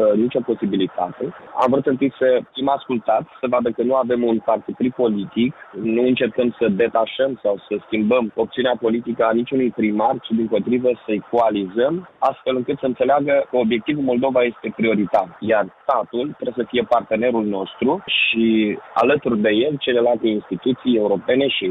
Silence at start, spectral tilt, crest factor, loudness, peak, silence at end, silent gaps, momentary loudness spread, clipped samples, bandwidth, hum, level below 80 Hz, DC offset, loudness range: 0 s; -8 dB/octave; 14 dB; -20 LUFS; -6 dBFS; 0 s; none; 5 LU; under 0.1%; 4.9 kHz; none; -58 dBFS; under 0.1%; 2 LU